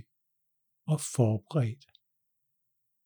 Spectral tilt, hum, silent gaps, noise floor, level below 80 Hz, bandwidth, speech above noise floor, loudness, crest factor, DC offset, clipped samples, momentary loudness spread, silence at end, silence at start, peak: -6.5 dB/octave; none; none; -80 dBFS; -76 dBFS; over 20 kHz; 51 dB; -30 LUFS; 22 dB; under 0.1%; under 0.1%; 15 LU; 1.3 s; 0.85 s; -12 dBFS